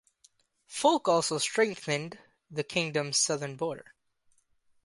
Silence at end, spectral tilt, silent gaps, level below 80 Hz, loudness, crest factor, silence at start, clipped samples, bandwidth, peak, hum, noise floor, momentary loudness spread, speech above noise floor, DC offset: 1.05 s; -3 dB/octave; none; -74 dBFS; -29 LUFS; 22 dB; 0.7 s; under 0.1%; 11.5 kHz; -10 dBFS; none; -69 dBFS; 13 LU; 40 dB; under 0.1%